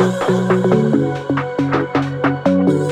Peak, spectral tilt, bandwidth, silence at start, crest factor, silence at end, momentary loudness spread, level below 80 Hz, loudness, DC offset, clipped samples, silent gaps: -2 dBFS; -7.5 dB/octave; 11 kHz; 0 s; 14 dB; 0 s; 5 LU; -50 dBFS; -17 LUFS; under 0.1%; under 0.1%; none